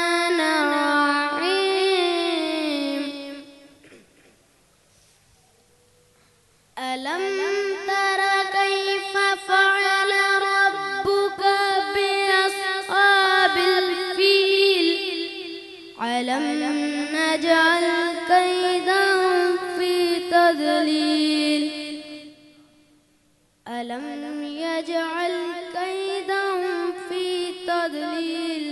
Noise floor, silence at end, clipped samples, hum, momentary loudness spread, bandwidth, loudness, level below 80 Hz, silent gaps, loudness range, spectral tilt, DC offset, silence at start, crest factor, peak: -62 dBFS; 0 s; under 0.1%; none; 13 LU; 12.5 kHz; -21 LUFS; -68 dBFS; none; 11 LU; -2 dB/octave; under 0.1%; 0 s; 18 dB; -4 dBFS